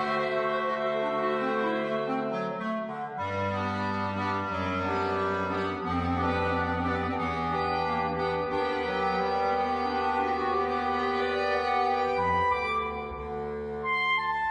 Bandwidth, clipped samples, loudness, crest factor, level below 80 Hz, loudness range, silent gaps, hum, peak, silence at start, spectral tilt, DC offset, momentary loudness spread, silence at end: 10 kHz; under 0.1%; -28 LUFS; 12 dB; -52 dBFS; 3 LU; none; none; -16 dBFS; 0 s; -6.5 dB/octave; under 0.1%; 5 LU; 0 s